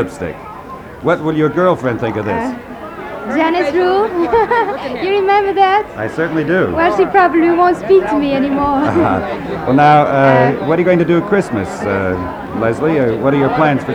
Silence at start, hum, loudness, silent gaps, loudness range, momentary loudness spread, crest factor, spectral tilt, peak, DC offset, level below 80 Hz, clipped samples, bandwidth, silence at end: 0 s; none; -14 LUFS; none; 4 LU; 11 LU; 14 dB; -7.5 dB/octave; 0 dBFS; under 0.1%; -42 dBFS; under 0.1%; 12 kHz; 0 s